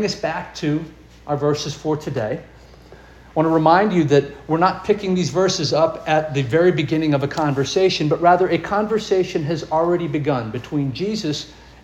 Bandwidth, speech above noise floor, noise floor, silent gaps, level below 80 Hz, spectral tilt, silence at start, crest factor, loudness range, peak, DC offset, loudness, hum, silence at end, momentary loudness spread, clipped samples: 12.5 kHz; 25 dB; -44 dBFS; none; -48 dBFS; -6 dB/octave; 0 s; 18 dB; 4 LU; -2 dBFS; under 0.1%; -19 LUFS; none; 0.2 s; 10 LU; under 0.1%